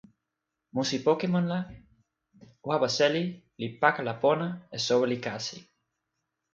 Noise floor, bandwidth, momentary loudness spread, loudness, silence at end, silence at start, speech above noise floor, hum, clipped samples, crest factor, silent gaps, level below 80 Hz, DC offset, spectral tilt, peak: -85 dBFS; 7.8 kHz; 12 LU; -28 LUFS; 0.9 s; 0.75 s; 57 dB; none; under 0.1%; 24 dB; none; -68 dBFS; under 0.1%; -5 dB/octave; -6 dBFS